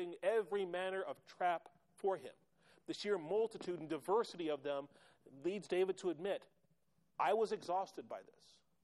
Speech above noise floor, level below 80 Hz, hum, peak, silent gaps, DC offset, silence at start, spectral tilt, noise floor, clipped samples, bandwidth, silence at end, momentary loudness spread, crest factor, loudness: 39 dB; -88 dBFS; none; -24 dBFS; none; under 0.1%; 0 s; -5 dB/octave; -80 dBFS; under 0.1%; 12.5 kHz; 0.6 s; 12 LU; 18 dB; -40 LUFS